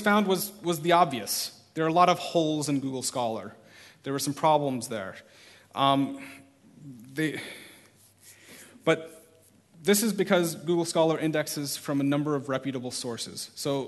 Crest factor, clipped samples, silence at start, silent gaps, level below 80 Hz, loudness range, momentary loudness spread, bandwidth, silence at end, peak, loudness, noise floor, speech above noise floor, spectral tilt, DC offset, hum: 22 dB; under 0.1%; 0 s; none; -72 dBFS; 6 LU; 18 LU; 12.5 kHz; 0 s; -6 dBFS; -27 LUFS; -59 dBFS; 32 dB; -4.5 dB/octave; under 0.1%; none